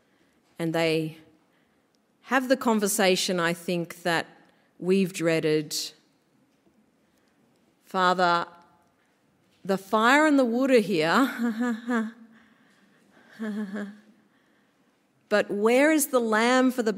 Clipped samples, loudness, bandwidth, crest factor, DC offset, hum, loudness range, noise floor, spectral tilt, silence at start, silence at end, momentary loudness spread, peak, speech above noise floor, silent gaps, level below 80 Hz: under 0.1%; -24 LUFS; 16 kHz; 20 dB; under 0.1%; none; 8 LU; -67 dBFS; -4 dB/octave; 0.6 s; 0 s; 14 LU; -6 dBFS; 43 dB; none; -78 dBFS